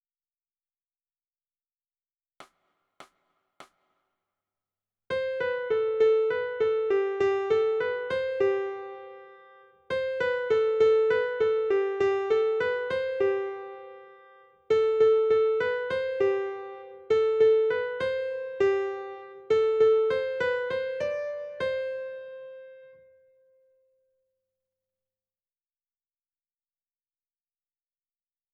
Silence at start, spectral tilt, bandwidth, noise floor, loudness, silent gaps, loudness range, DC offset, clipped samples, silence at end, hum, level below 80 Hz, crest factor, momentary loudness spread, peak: 2.4 s; -5.5 dB/octave; 7 kHz; under -90 dBFS; -26 LUFS; none; 9 LU; under 0.1%; under 0.1%; 5.65 s; none; -68 dBFS; 16 dB; 17 LU; -12 dBFS